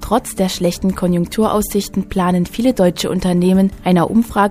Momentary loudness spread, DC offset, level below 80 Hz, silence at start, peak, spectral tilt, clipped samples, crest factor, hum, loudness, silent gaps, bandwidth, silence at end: 5 LU; under 0.1%; -36 dBFS; 0 s; 0 dBFS; -6 dB/octave; under 0.1%; 14 dB; none; -16 LUFS; none; 15.5 kHz; 0 s